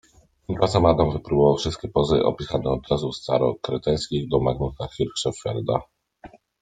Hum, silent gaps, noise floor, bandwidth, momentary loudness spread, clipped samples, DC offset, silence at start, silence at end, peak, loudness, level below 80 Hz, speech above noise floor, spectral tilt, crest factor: none; none; -48 dBFS; 9.4 kHz; 9 LU; under 0.1%; under 0.1%; 0.5 s; 0.35 s; -2 dBFS; -23 LUFS; -42 dBFS; 26 dB; -6.5 dB/octave; 20 dB